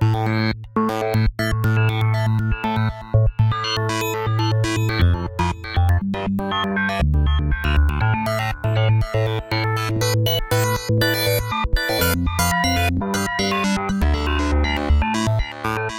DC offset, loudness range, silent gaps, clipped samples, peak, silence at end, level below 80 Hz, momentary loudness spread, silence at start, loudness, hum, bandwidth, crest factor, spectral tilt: under 0.1%; 1 LU; none; under 0.1%; -2 dBFS; 0 s; -26 dBFS; 4 LU; 0 s; -20 LUFS; none; 17 kHz; 16 dB; -5.5 dB/octave